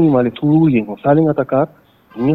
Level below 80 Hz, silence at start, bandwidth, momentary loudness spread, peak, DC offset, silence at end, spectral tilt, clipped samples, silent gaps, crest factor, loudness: -48 dBFS; 0 s; 4.1 kHz; 6 LU; 0 dBFS; under 0.1%; 0 s; -11 dB/octave; under 0.1%; none; 14 dB; -15 LUFS